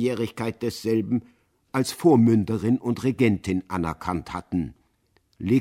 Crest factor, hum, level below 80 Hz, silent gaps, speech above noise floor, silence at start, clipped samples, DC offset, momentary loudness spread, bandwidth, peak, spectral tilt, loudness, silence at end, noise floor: 18 dB; none; -52 dBFS; none; 43 dB; 0 s; under 0.1%; under 0.1%; 11 LU; 16 kHz; -6 dBFS; -7 dB/octave; -24 LUFS; 0 s; -66 dBFS